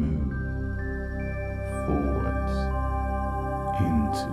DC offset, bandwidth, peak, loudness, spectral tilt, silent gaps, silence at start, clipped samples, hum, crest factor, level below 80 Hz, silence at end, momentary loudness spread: under 0.1%; 12.5 kHz; -12 dBFS; -29 LUFS; -8 dB/octave; none; 0 s; under 0.1%; none; 14 dB; -32 dBFS; 0 s; 7 LU